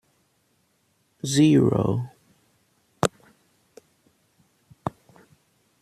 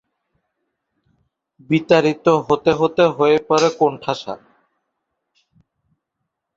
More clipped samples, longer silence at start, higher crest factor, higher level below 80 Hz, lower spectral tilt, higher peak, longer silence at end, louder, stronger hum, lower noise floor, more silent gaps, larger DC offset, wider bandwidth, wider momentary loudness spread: neither; second, 1.25 s vs 1.7 s; first, 24 dB vs 18 dB; about the same, -58 dBFS vs -58 dBFS; about the same, -6 dB/octave vs -5.5 dB/octave; about the same, -2 dBFS vs -2 dBFS; second, 0.9 s vs 2.2 s; second, -23 LUFS vs -17 LUFS; neither; second, -68 dBFS vs -78 dBFS; neither; neither; first, 14 kHz vs 7.8 kHz; first, 18 LU vs 11 LU